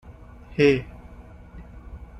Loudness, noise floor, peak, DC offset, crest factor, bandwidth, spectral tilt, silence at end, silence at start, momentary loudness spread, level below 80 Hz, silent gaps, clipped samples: -22 LUFS; -44 dBFS; -6 dBFS; under 0.1%; 22 dB; 8.4 kHz; -7 dB/octave; 0 s; 0.1 s; 26 LU; -44 dBFS; none; under 0.1%